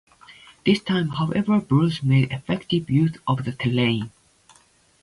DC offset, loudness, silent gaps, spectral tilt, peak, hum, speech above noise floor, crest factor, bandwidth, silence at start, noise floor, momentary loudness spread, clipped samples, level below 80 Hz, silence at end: under 0.1%; -22 LUFS; none; -7.5 dB/octave; -6 dBFS; none; 37 dB; 18 dB; 11.5 kHz; 0.3 s; -58 dBFS; 6 LU; under 0.1%; -54 dBFS; 0.95 s